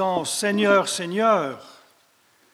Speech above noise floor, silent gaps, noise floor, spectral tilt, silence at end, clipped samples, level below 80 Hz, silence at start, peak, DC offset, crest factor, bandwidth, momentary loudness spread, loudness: 39 dB; none; -61 dBFS; -3.5 dB/octave; 0.8 s; under 0.1%; -72 dBFS; 0 s; -4 dBFS; under 0.1%; 20 dB; 15.5 kHz; 10 LU; -21 LUFS